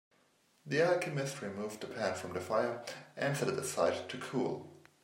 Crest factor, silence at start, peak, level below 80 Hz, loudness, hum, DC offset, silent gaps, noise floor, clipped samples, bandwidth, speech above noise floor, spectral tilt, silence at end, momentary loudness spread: 20 dB; 0.65 s; -16 dBFS; -80 dBFS; -35 LUFS; none; under 0.1%; none; -71 dBFS; under 0.1%; 16 kHz; 36 dB; -4.5 dB/octave; 0.25 s; 10 LU